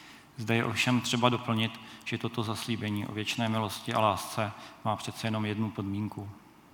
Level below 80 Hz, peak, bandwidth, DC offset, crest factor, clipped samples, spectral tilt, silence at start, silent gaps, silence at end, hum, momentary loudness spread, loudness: -72 dBFS; -8 dBFS; 19 kHz; under 0.1%; 24 dB; under 0.1%; -5 dB/octave; 0 s; none; 0.35 s; none; 10 LU; -31 LUFS